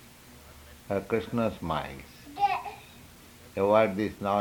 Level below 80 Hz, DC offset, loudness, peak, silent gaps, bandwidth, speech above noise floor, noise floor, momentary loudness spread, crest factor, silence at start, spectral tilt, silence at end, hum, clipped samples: -56 dBFS; under 0.1%; -29 LUFS; -8 dBFS; none; 19.5 kHz; 24 dB; -51 dBFS; 26 LU; 22 dB; 0 s; -6.5 dB/octave; 0 s; none; under 0.1%